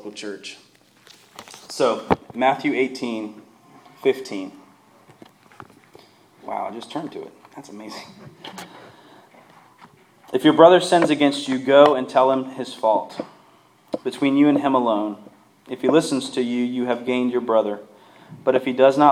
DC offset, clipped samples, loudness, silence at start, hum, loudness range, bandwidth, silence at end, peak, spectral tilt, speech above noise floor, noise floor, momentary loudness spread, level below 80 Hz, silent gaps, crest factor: under 0.1%; under 0.1%; -20 LUFS; 0.05 s; none; 18 LU; 14 kHz; 0 s; 0 dBFS; -5 dB/octave; 35 dB; -54 dBFS; 23 LU; -62 dBFS; none; 22 dB